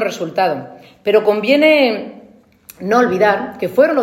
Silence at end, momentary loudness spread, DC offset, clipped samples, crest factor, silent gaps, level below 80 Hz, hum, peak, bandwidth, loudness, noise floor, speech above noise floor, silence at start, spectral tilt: 0 s; 14 LU; under 0.1%; under 0.1%; 14 dB; none; -60 dBFS; none; 0 dBFS; 16.5 kHz; -15 LUFS; -46 dBFS; 31 dB; 0 s; -5 dB/octave